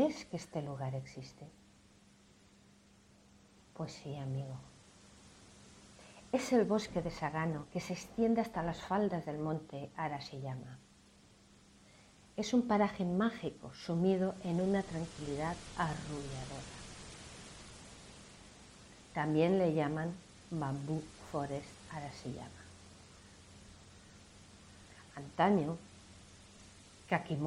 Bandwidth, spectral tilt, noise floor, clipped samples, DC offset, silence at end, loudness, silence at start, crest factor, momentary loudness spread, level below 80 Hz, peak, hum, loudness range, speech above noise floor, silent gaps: 13 kHz; -6.5 dB/octave; -64 dBFS; under 0.1%; under 0.1%; 0 s; -37 LUFS; 0 s; 22 dB; 25 LU; -62 dBFS; -18 dBFS; none; 13 LU; 28 dB; none